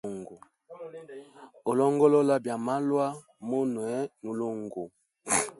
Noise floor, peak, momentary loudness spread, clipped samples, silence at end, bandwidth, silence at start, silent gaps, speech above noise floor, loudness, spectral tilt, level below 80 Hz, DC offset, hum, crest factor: -50 dBFS; -10 dBFS; 23 LU; under 0.1%; 0.05 s; 12 kHz; 0.05 s; none; 23 dB; -28 LUFS; -5 dB/octave; -72 dBFS; under 0.1%; none; 20 dB